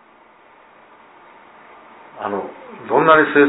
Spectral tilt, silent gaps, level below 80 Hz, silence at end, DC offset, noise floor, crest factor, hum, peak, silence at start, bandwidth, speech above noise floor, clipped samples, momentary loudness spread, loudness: -9.5 dB/octave; none; -64 dBFS; 0 s; under 0.1%; -49 dBFS; 20 dB; none; 0 dBFS; 2.15 s; 4 kHz; 34 dB; under 0.1%; 21 LU; -17 LUFS